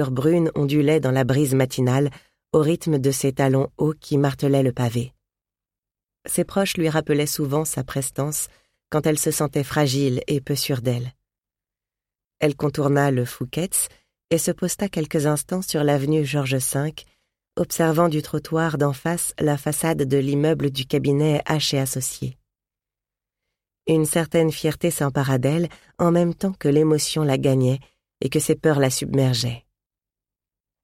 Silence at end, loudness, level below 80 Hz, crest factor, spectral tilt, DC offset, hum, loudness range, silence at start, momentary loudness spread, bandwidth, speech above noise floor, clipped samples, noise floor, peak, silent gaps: 1.25 s; -22 LUFS; -52 dBFS; 18 dB; -5.5 dB/octave; under 0.1%; 50 Hz at -50 dBFS; 4 LU; 0 s; 7 LU; 16.5 kHz; 69 dB; under 0.1%; -90 dBFS; -4 dBFS; none